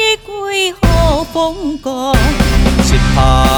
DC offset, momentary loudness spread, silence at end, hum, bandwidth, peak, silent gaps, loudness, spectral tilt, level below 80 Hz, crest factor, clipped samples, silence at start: under 0.1%; 7 LU; 0 s; none; over 20 kHz; 0 dBFS; none; -13 LUFS; -5 dB/octave; -16 dBFS; 12 dB; under 0.1%; 0 s